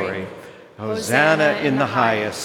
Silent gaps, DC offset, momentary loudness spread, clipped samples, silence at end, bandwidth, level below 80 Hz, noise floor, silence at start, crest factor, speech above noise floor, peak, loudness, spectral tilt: none; under 0.1%; 16 LU; under 0.1%; 0 s; 17 kHz; -66 dBFS; -40 dBFS; 0 s; 18 dB; 21 dB; -2 dBFS; -18 LUFS; -4.5 dB/octave